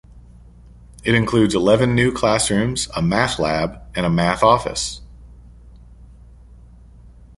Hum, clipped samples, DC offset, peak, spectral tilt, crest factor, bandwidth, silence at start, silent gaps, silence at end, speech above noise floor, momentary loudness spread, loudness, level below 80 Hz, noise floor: none; under 0.1%; under 0.1%; 0 dBFS; -5 dB/octave; 20 dB; 11.5 kHz; 0.15 s; none; 0.3 s; 26 dB; 9 LU; -18 LUFS; -40 dBFS; -44 dBFS